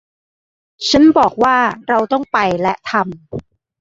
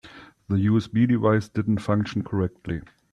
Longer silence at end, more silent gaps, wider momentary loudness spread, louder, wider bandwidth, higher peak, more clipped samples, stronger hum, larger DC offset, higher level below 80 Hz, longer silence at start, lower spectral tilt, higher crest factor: about the same, 0.4 s vs 0.3 s; neither; first, 15 LU vs 10 LU; first, -14 LUFS vs -24 LUFS; second, 7.8 kHz vs 9.8 kHz; first, -2 dBFS vs -8 dBFS; neither; neither; neither; first, -46 dBFS vs -52 dBFS; first, 0.8 s vs 0.05 s; second, -4.5 dB/octave vs -8.5 dB/octave; about the same, 14 dB vs 16 dB